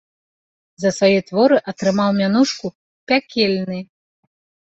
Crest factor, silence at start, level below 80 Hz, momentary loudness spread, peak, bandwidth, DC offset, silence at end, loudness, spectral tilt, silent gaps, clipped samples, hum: 16 dB; 0.8 s; -62 dBFS; 12 LU; -2 dBFS; 8.2 kHz; under 0.1%; 0.85 s; -18 LUFS; -5.5 dB/octave; 2.75-3.07 s; under 0.1%; none